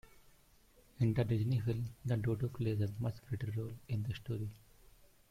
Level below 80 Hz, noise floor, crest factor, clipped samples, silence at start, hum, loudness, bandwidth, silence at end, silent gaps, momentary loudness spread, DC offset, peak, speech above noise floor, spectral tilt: -60 dBFS; -66 dBFS; 16 dB; under 0.1%; 1 s; none; -38 LUFS; 15 kHz; 0.25 s; none; 8 LU; under 0.1%; -22 dBFS; 29 dB; -8.5 dB/octave